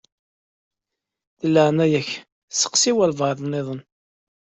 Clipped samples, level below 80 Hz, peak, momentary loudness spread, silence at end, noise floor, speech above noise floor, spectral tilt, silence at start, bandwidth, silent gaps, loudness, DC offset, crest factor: under 0.1%; -64 dBFS; -4 dBFS; 14 LU; 0.7 s; -85 dBFS; 65 dB; -4 dB/octave; 1.45 s; 8.2 kHz; 2.32-2.48 s; -20 LUFS; under 0.1%; 20 dB